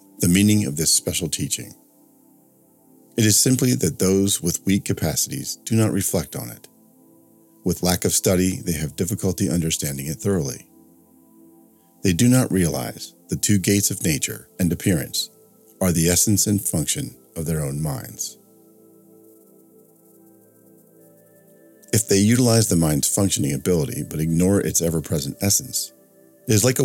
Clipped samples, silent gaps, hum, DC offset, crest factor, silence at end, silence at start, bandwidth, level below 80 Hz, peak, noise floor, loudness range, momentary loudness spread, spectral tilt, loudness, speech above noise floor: under 0.1%; none; none; under 0.1%; 20 dB; 0 s; 0.2 s; 17.5 kHz; -46 dBFS; -2 dBFS; -56 dBFS; 6 LU; 12 LU; -4.5 dB/octave; -20 LUFS; 35 dB